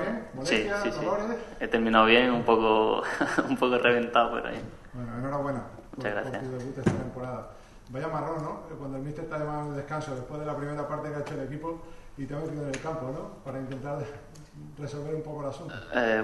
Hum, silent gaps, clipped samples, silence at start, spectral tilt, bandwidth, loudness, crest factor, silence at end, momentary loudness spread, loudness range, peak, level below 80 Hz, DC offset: none; none; under 0.1%; 0 s; -5.5 dB/octave; 12 kHz; -29 LUFS; 24 dB; 0 s; 17 LU; 12 LU; -4 dBFS; -50 dBFS; under 0.1%